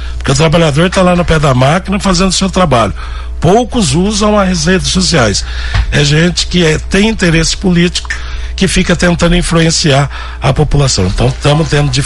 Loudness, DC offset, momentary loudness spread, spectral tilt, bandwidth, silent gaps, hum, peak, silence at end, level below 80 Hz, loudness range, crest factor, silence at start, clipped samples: -10 LUFS; under 0.1%; 6 LU; -4.5 dB/octave; 12 kHz; none; none; 0 dBFS; 0 s; -20 dBFS; 1 LU; 10 dB; 0 s; under 0.1%